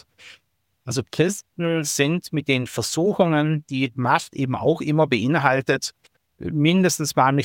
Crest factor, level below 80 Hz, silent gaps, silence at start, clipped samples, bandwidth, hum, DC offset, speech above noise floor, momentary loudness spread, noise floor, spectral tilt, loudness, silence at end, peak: 18 dB; -58 dBFS; none; 0.25 s; under 0.1%; 17 kHz; none; under 0.1%; 47 dB; 8 LU; -68 dBFS; -5 dB/octave; -21 LUFS; 0 s; -2 dBFS